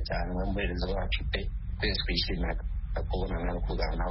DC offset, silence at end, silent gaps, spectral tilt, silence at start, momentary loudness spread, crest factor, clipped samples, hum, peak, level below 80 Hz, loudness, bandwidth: under 0.1%; 0 s; none; -4 dB/octave; 0 s; 5 LU; 16 dB; under 0.1%; none; -14 dBFS; -32 dBFS; -32 LUFS; 5.8 kHz